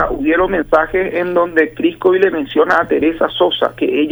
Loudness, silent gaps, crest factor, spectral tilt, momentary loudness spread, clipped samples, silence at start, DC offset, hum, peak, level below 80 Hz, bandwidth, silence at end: -14 LUFS; none; 14 dB; -6.5 dB/octave; 3 LU; under 0.1%; 0 s; under 0.1%; none; 0 dBFS; -38 dBFS; over 20 kHz; 0 s